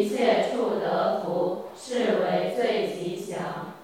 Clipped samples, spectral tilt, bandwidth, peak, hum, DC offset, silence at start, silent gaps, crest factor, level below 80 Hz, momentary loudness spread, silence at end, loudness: under 0.1%; -5 dB/octave; 16 kHz; -8 dBFS; none; under 0.1%; 0 s; none; 18 dB; -76 dBFS; 10 LU; 0 s; -26 LUFS